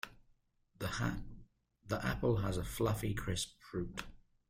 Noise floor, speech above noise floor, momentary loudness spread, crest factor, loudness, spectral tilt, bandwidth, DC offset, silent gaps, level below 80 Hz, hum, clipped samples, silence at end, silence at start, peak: -72 dBFS; 35 dB; 13 LU; 16 dB; -38 LUFS; -5.5 dB/octave; 16 kHz; under 0.1%; none; -52 dBFS; none; under 0.1%; 0.3 s; 0.05 s; -22 dBFS